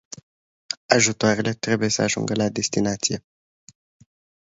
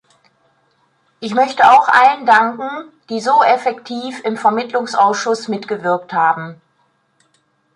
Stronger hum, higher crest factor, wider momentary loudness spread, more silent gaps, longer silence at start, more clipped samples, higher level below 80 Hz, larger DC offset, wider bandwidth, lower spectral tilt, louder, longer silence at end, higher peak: neither; first, 24 dB vs 16 dB; about the same, 14 LU vs 16 LU; first, 0.77-0.89 s vs none; second, 0.7 s vs 1.2 s; neither; first, -58 dBFS vs -68 dBFS; neither; second, 8 kHz vs 11 kHz; about the same, -3.5 dB/octave vs -4 dB/octave; second, -22 LUFS vs -15 LUFS; about the same, 1.3 s vs 1.2 s; about the same, 0 dBFS vs 0 dBFS